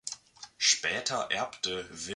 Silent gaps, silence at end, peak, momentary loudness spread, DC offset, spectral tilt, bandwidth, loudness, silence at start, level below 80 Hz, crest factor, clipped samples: none; 0 s; -10 dBFS; 17 LU; under 0.1%; 0 dB/octave; 11.5 kHz; -29 LUFS; 0.05 s; -68 dBFS; 22 dB; under 0.1%